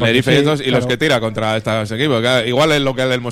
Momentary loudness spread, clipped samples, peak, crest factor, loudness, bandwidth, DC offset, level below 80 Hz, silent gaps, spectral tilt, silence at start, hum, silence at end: 5 LU; under 0.1%; 0 dBFS; 14 dB; -15 LUFS; 16 kHz; under 0.1%; -44 dBFS; none; -5 dB/octave; 0 s; none; 0 s